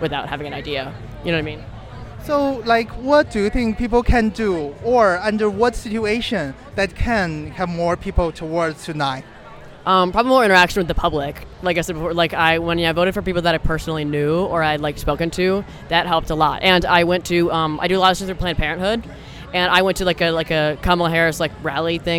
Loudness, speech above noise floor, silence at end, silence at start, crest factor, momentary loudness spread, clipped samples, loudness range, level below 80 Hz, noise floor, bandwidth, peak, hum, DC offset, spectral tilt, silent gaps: -19 LUFS; 20 dB; 0 s; 0 s; 18 dB; 10 LU; under 0.1%; 4 LU; -32 dBFS; -39 dBFS; 18 kHz; 0 dBFS; none; under 0.1%; -5 dB/octave; none